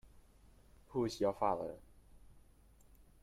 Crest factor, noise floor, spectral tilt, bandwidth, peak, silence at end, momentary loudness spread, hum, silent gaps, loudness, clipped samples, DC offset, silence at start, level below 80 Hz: 22 dB; -64 dBFS; -6 dB/octave; 15.5 kHz; -20 dBFS; 0.85 s; 12 LU; none; none; -38 LUFS; under 0.1%; under 0.1%; 0.05 s; -64 dBFS